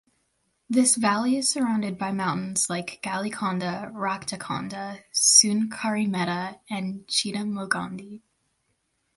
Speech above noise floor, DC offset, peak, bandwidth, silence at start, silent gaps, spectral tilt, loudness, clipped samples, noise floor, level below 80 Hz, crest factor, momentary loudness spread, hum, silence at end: 48 dB; under 0.1%; -4 dBFS; 12 kHz; 0.7 s; none; -2.5 dB/octave; -24 LUFS; under 0.1%; -73 dBFS; -68 dBFS; 22 dB; 13 LU; none; 1 s